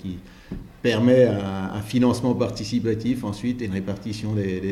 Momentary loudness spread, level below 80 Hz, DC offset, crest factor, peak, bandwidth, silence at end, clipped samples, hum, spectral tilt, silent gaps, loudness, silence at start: 16 LU; -48 dBFS; under 0.1%; 18 dB; -6 dBFS; 13 kHz; 0 s; under 0.1%; none; -7 dB/octave; none; -23 LUFS; 0 s